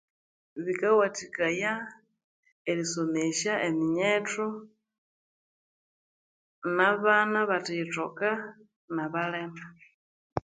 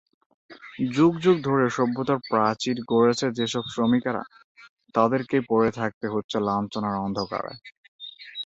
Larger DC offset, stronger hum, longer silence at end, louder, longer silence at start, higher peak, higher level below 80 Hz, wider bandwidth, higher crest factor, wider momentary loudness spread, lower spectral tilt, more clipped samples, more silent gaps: neither; neither; about the same, 0.05 s vs 0 s; second, -28 LUFS vs -24 LUFS; about the same, 0.55 s vs 0.5 s; about the same, -8 dBFS vs -6 dBFS; second, -68 dBFS vs -62 dBFS; first, 9.6 kHz vs 8 kHz; about the same, 22 dB vs 18 dB; about the same, 15 LU vs 15 LU; second, -4 dB/octave vs -6 dB/octave; neither; first, 2.24-2.43 s, 2.52-2.65 s, 4.98-6.62 s, 8.76-8.88 s, 9.94-10.36 s vs 4.44-4.55 s, 4.69-4.77 s, 5.94-6.01 s, 6.24-6.29 s, 7.78-7.99 s